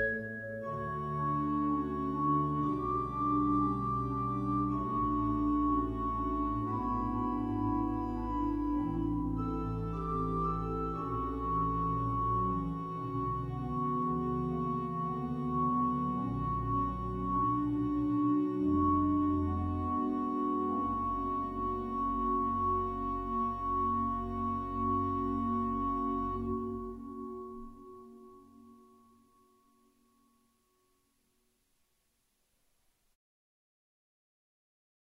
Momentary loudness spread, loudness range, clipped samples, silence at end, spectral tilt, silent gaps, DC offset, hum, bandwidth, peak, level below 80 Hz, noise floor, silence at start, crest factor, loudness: 6 LU; 4 LU; under 0.1%; 6.3 s; -10 dB/octave; none; under 0.1%; none; 5.8 kHz; -18 dBFS; -46 dBFS; -77 dBFS; 0 s; 16 dB; -33 LUFS